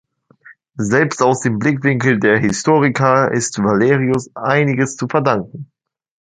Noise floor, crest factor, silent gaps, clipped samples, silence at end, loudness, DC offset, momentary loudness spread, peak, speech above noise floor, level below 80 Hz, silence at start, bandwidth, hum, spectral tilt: -46 dBFS; 16 dB; none; under 0.1%; 0.75 s; -15 LUFS; under 0.1%; 6 LU; 0 dBFS; 31 dB; -52 dBFS; 0.5 s; 9.6 kHz; none; -5.5 dB/octave